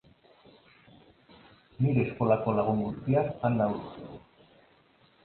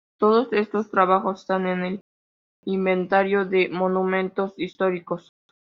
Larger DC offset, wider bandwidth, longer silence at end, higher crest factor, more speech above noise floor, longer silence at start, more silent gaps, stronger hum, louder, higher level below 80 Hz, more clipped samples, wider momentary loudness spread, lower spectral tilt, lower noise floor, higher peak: neither; second, 4.4 kHz vs 6.6 kHz; first, 1.05 s vs 0.6 s; about the same, 20 dB vs 20 dB; second, 36 dB vs over 68 dB; first, 1.8 s vs 0.2 s; second, none vs 2.01-2.63 s; neither; second, -28 LUFS vs -23 LUFS; first, -60 dBFS vs -68 dBFS; neither; first, 18 LU vs 10 LU; first, -12 dB/octave vs -5 dB/octave; second, -63 dBFS vs under -90 dBFS; second, -12 dBFS vs -2 dBFS